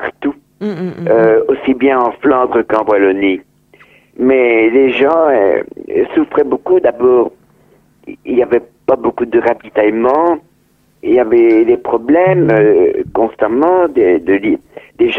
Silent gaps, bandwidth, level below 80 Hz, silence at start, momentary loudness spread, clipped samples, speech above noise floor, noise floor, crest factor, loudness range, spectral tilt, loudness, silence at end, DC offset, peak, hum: none; 4.3 kHz; -50 dBFS; 0 s; 10 LU; under 0.1%; 43 dB; -54 dBFS; 12 dB; 4 LU; -8.5 dB/octave; -12 LUFS; 0 s; under 0.1%; 0 dBFS; none